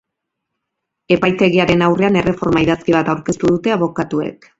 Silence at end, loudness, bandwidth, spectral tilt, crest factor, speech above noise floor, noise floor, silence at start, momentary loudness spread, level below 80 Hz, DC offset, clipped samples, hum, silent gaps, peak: 0.25 s; -15 LUFS; 8 kHz; -6.5 dB/octave; 16 dB; 63 dB; -78 dBFS; 1.1 s; 6 LU; -44 dBFS; under 0.1%; under 0.1%; none; none; 0 dBFS